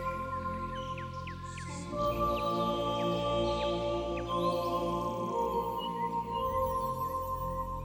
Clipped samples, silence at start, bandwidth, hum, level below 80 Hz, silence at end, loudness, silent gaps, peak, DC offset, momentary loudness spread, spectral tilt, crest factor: under 0.1%; 0 s; 17.5 kHz; none; -48 dBFS; 0 s; -33 LUFS; none; -18 dBFS; under 0.1%; 8 LU; -6 dB/octave; 14 dB